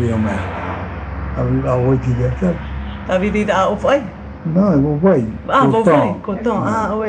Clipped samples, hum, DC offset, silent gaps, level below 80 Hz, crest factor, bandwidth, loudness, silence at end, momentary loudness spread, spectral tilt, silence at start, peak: under 0.1%; none; under 0.1%; none; -32 dBFS; 16 dB; 9.4 kHz; -17 LUFS; 0 s; 12 LU; -8 dB/octave; 0 s; 0 dBFS